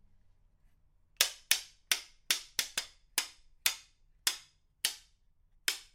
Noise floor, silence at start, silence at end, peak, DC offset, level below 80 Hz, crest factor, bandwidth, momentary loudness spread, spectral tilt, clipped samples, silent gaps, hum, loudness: -67 dBFS; 1.2 s; 0.1 s; -4 dBFS; under 0.1%; -68 dBFS; 34 dB; 16.5 kHz; 8 LU; 3 dB/octave; under 0.1%; none; none; -33 LUFS